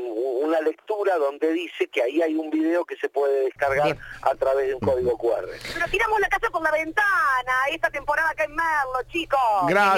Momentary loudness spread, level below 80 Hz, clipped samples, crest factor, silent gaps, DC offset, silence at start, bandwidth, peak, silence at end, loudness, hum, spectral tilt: 6 LU; -48 dBFS; under 0.1%; 16 dB; none; under 0.1%; 0 s; 17 kHz; -6 dBFS; 0 s; -23 LUFS; none; -5 dB/octave